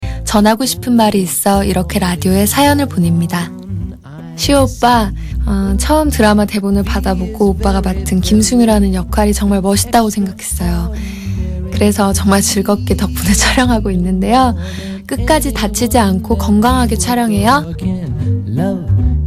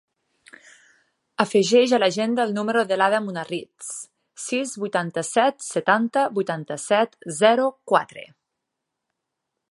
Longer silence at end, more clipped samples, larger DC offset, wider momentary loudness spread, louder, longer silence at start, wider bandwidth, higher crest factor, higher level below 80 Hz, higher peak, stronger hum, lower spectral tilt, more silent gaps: second, 0 s vs 1.45 s; neither; neither; second, 9 LU vs 16 LU; first, -13 LUFS vs -22 LUFS; second, 0 s vs 1.4 s; first, 16 kHz vs 11.5 kHz; second, 12 dB vs 22 dB; first, -22 dBFS vs -76 dBFS; about the same, 0 dBFS vs -2 dBFS; neither; about the same, -5 dB/octave vs -4 dB/octave; neither